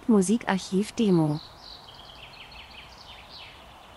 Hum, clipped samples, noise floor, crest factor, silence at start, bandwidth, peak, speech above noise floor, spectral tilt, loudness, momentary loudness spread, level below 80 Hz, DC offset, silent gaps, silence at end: none; under 0.1%; -48 dBFS; 20 dB; 0.1 s; 12 kHz; -8 dBFS; 24 dB; -6 dB/octave; -25 LUFS; 22 LU; -56 dBFS; under 0.1%; none; 0.45 s